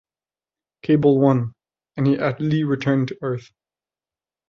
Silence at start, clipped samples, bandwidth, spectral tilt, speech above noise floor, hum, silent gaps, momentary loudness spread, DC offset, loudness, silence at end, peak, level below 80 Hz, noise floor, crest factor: 0.85 s; under 0.1%; 6.8 kHz; -9 dB/octave; over 71 dB; none; none; 15 LU; under 0.1%; -20 LUFS; 1.1 s; -4 dBFS; -58 dBFS; under -90 dBFS; 18 dB